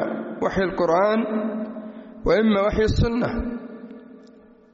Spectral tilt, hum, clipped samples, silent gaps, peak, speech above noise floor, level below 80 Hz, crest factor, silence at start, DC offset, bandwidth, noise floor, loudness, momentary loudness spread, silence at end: -5.5 dB/octave; none; under 0.1%; none; -8 dBFS; 29 dB; -36 dBFS; 14 dB; 0 s; under 0.1%; 7.6 kHz; -50 dBFS; -22 LUFS; 20 LU; 0.5 s